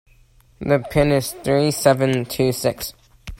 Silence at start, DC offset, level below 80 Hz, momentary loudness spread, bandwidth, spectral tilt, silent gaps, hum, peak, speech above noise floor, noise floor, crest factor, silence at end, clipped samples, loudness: 0.6 s; under 0.1%; -42 dBFS; 10 LU; 16.5 kHz; -5.5 dB/octave; none; none; 0 dBFS; 34 dB; -53 dBFS; 20 dB; 0.05 s; under 0.1%; -19 LUFS